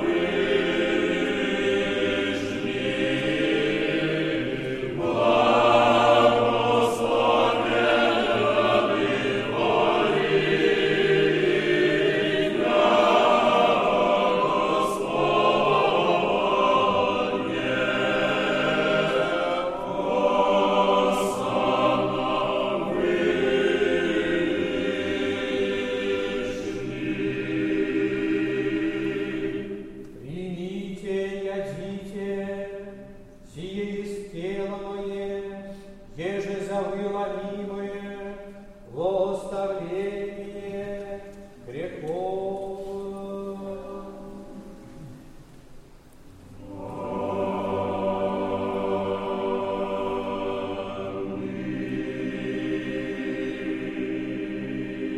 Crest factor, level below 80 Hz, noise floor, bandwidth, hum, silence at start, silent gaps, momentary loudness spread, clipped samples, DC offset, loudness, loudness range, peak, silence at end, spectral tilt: 18 dB; -52 dBFS; -48 dBFS; 13.5 kHz; none; 0 s; none; 14 LU; under 0.1%; under 0.1%; -24 LUFS; 13 LU; -6 dBFS; 0 s; -5.5 dB/octave